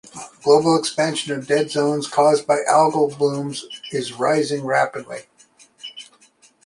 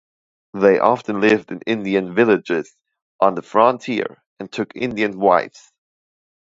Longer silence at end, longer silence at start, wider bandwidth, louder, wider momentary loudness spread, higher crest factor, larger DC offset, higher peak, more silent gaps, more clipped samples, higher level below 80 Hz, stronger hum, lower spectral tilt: second, 0.6 s vs 1 s; second, 0.15 s vs 0.55 s; first, 11.5 kHz vs 7.8 kHz; about the same, -19 LUFS vs -18 LUFS; first, 20 LU vs 14 LU; about the same, 18 dB vs 20 dB; neither; about the same, -2 dBFS vs 0 dBFS; second, none vs 3.02-3.19 s, 4.26-4.37 s; neither; about the same, -66 dBFS vs -62 dBFS; neither; second, -4.5 dB/octave vs -6.5 dB/octave